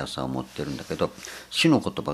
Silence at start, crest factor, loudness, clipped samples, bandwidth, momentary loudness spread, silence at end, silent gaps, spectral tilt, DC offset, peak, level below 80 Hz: 0 s; 20 dB; -26 LUFS; under 0.1%; 14.5 kHz; 12 LU; 0 s; none; -5 dB/octave; under 0.1%; -6 dBFS; -52 dBFS